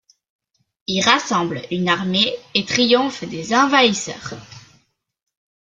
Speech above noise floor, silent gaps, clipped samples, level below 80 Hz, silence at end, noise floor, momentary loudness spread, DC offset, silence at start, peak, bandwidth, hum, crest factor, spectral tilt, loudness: 42 dB; none; under 0.1%; -60 dBFS; 1.1 s; -61 dBFS; 14 LU; under 0.1%; 0.9 s; 0 dBFS; 9.4 kHz; none; 20 dB; -3.5 dB/octave; -18 LUFS